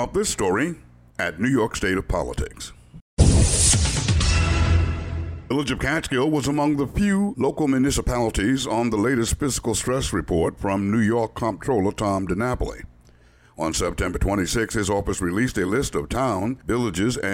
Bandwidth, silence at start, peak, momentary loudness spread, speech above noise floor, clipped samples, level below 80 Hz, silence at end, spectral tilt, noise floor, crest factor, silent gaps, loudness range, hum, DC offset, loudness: 16 kHz; 0 s; -4 dBFS; 8 LU; 30 dB; under 0.1%; -30 dBFS; 0 s; -4.5 dB/octave; -53 dBFS; 18 dB; 3.01-3.17 s; 5 LU; none; under 0.1%; -22 LUFS